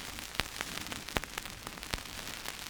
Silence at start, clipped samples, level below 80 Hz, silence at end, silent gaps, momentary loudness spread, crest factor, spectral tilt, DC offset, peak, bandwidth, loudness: 0 s; under 0.1%; -52 dBFS; 0 s; none; 4 LU; 34 dB; -2 dB/octave; under 0.1%; -6 dBFS; over 20 kHz; -38 LUFS